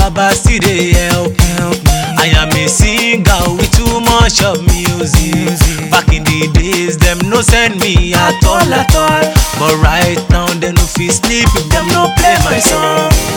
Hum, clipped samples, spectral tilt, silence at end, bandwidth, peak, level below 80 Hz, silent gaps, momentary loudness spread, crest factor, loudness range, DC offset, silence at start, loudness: none; 0.8%; -4 dB/octave; 0 s; over 20 kHz; 0 dBFS; -16 dBFS; none; 3 LU; 10 dB; 1 LU; under 0.1%; 0 s; -10 LUFS